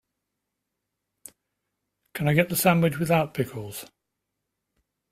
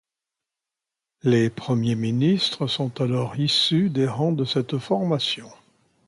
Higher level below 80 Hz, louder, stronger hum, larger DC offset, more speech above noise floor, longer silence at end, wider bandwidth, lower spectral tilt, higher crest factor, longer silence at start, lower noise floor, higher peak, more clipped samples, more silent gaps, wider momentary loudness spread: about the same, -60 dBFS vs -62 dBFS; about the same, -23 LUFS vs -23 LUFS; first, 50 Hz at -45 dBFS vs none; neither; second, 59 dB vs 65 dB; first, 1.25 s vs 0.55 s; first, 16 kHz vs 11.5 kHz; about the same, -5.5 dB/octave vs -6 dB/octave; first, 24 dB vs 16 dB; first, 2.15 s vs 1.25 s; second, -82 dBFS vs -87 dBFS; first, -4 dBFS vs -8 dBFS; neither; neither; first, 17 LU vs 6 LU